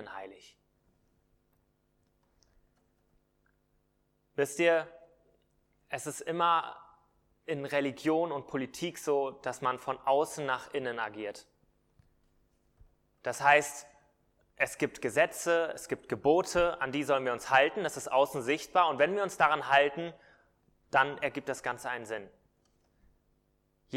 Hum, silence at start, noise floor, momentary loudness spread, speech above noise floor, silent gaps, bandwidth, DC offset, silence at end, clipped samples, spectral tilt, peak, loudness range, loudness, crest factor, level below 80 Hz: none; 0 s; -75 dBFS; 15 LU; 44 dB; none; 16.5 kHz; under 0.1%; 0 s; under 0.1%; -3.5 dB/octave; -8 dBFS; 7 LU; -30 LUFS; 24 dB; -66 dBFS